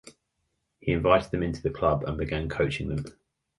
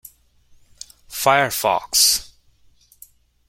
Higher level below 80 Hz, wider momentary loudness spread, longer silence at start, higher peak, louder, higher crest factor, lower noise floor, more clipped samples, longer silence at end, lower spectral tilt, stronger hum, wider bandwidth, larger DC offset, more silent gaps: first, -42 dBFS vs -54 dBFS; second, 11 LU vs 26 LU; second, 0.05 s vs 1.1 s; second, -6 dBFS vs -2 dBFS; second, -27 LUFS vs -17 LUFS; about the same, 22 dB vs 22 dB; first, -78 dBFS vs -55 dBFS; neither; second, 0.5 s vs 1.25 s; first, -7 dB/octave vs -0.5 dB/octave; neither; second, 11.5 kHz vs 16.5 kHz; neither; neither